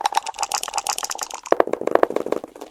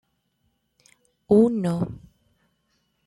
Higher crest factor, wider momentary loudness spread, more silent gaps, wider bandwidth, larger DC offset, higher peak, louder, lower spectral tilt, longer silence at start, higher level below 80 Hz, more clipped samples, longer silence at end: about the same, 24 dB vs 20 dB; second, 8 LU vs 15 LU; neither; first, 16.5 kHz vs 11.5 kHz; neither; first, 0 dBFS vs -6 dBFS; about the same, -23 LUFS vs -22 LUFS; second, -1.5 dB/octave vs -9 dB/octave; second, 0 s vs 1.3 s; about the same, -60 dBFS vs -58 dBFS; neither; second, 0 s vs 1.1 s